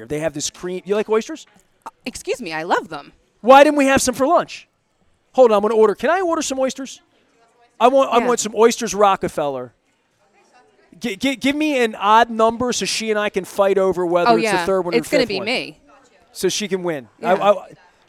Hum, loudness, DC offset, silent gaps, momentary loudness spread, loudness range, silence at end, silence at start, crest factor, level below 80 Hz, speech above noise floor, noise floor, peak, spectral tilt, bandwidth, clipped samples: none; -17 LUFS; under 0.1%; none; 16 LU; 5 LU; 0.4 s; 0 s; 18 dB; -54 dBFS; 45 dB; -62 dBFS; 0 dBFS; -3.5 dB/octave; 15.5 kHz; under 0.1%